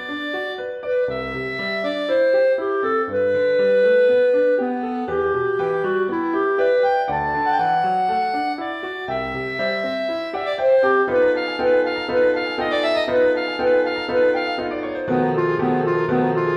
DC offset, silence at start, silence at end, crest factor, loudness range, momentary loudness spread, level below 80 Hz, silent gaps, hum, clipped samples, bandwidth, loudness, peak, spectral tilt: under 0.1%; 0 s; 0 s; 12 dB; 3 LU; 8 LU; -52 dBFS; none; none; under 0.1%; 6.2 kHz; -20 LUFS; -8 dBFS; -6.5 dB/octave